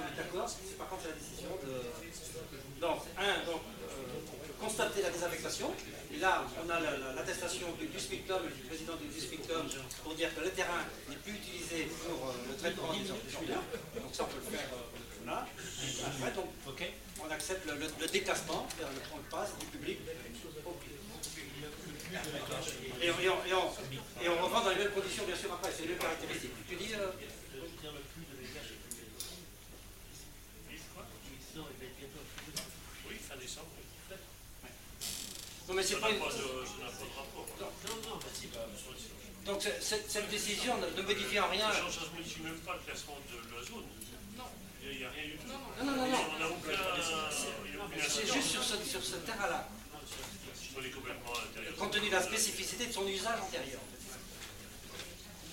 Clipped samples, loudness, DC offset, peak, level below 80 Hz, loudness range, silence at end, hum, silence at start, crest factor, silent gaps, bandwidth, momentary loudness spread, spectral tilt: under 0.1%; -38 LUFS; under 0.1%; -16 dBFS; -58 dBFS; 11 LU; 0 s; none; 0 s; 22 dB; none; 16 kHz; 15 LU; -2.5 dB/octave